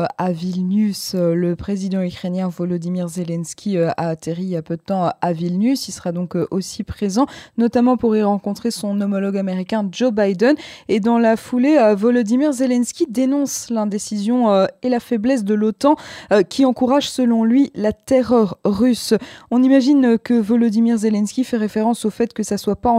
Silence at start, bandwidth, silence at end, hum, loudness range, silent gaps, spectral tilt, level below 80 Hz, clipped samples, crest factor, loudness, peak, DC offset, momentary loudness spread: 0 s; 15 kHz; 0 s; none; 5 LU; none; -6 dB/octave; -50 dBFS; under 0.1%; 16 dB; -18 LUFS; -2 dBFS; under 0.1%; 8 LU